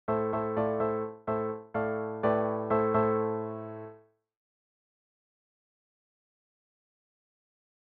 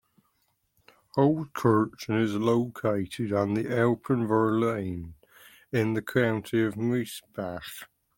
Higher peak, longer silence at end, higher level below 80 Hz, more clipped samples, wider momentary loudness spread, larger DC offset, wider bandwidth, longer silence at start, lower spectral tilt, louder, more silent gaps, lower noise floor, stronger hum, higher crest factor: second, -14 dBFS vs -10 dBFS; first, 3.9 s vs 0.35 s; about the same, -66 dBFS vs -62 dBFS; neither; about the same, 12 LU vs 12 LU; neither; second, 4.4 kHz vs 17 kHz; second, 0.1 s vs 1.15 s; about the same, -7.5 dB/octave vs -7 dB/octave; second, -30 LUFS vs -27 LUFS; neither; second, -56 dBFS vs -73 dBFS; neither; about the same, 18 dB vs 18 dB